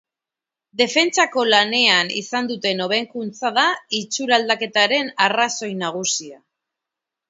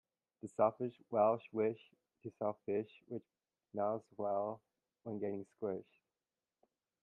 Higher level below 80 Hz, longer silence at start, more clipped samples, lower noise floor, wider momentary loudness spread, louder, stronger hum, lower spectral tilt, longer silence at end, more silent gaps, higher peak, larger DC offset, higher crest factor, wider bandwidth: first, -74 dBFS vs -84 dBFS; first, 0.75 s vs 0.45 s; neither; about the same, -88 dBFS vs under -90 dBFS; second, 9 LU vs 18 LU; first, -18 LUFS vs -39 LUFS; neither; second, -1.5 dB/octave vs -8.5 dB/octave; second, 0.95 s vs 1.2 s; neither; first, 0 dBFS vs -18 dBFS; neither; about the same, 20 dB vs 22 dB; about the same, 8 kHz vs 8.8 kHz